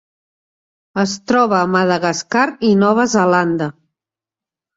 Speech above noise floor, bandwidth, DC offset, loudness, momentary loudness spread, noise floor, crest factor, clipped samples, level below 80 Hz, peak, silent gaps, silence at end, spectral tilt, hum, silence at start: 74 dB; 7.8 kHz; under 0.1%; -15 LUFS; 7 LU; -89 dBFS; 16 dB; under 0.1%; -58 dBFS; -2 dBFS; none; 1.05 s; -5 dB/octave; none; 0.95 s